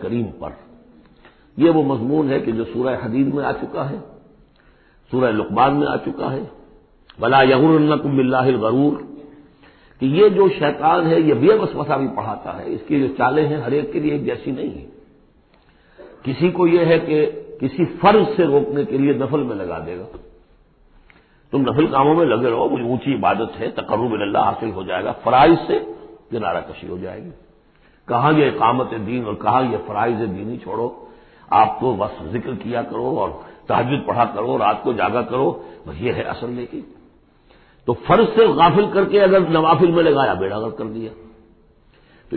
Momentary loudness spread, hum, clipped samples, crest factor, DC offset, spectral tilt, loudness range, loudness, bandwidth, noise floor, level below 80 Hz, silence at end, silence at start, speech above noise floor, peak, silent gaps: 15 LU; none; under 0.1%; 16 dB; under 0.1%; -12 dB/octave; 6 LU; -18 LUFS; 4.5 kHz; -54 dBFS; -48 dBFS; 0 s; 0 s; 36 dB; -2 dBFS; none